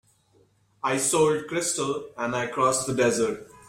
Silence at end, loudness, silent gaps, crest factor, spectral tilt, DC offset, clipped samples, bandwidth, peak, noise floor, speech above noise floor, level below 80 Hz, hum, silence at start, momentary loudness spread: 0.15 s; -25 LUFS; none; 16 dB; -3.5 dB/octave; under 0.1%; under 0.1%; 16 kHz; -10 dBFS; -63 dBFS; 38 dB; -62 dBFS; none; 0.85 s; 8 LU